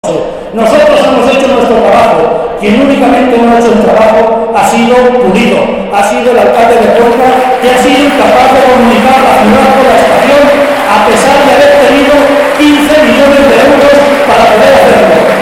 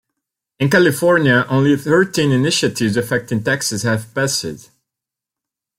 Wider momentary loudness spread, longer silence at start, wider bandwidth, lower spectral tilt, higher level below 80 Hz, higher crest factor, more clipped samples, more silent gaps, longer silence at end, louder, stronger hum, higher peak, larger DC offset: about the same, 4 LU vs 6 LU; second, 0.05 s vs 0.6 s; about the same, 16.5 kHz vs 16.5 kHz; about the same, -4.5 dB/octave vs -4.5 dB/octave; first, -32 dBFS vs -54 dBFS; second, 4 dB vs 16 dB; first, 5% vs under 0.1%; neither; second, 0 s vs 1.2 s; first, -5 LUFS vs -16 LUFS; neither; about the same, 0 dBFS vs 0 dBFS; first, 0.4% vs under 0.1%